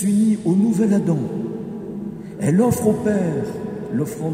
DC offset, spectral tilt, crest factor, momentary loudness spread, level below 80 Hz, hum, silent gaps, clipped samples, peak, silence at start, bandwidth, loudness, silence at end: under 0.1%; -7.5 dB/octave; 16 dB; 13 LU; -54 dBFS; none; none; under 0.1%; -4 dBFS; 0 s; 16 kHz; -20 LUFS; 0 s